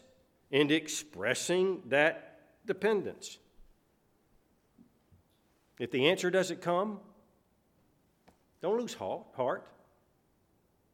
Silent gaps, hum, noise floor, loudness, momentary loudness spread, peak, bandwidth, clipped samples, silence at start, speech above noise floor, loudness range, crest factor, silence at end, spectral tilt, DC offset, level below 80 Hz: none; none; -71 dBFS; -32 LUFS; 15 LU; -10 dBFS; 16.5 kHz; under 0.1%; 0.5 s; 40 dB; 8 LU; 24 dB; 1.3 s; -4 dB/octave; under 0.1%; -74 dBFS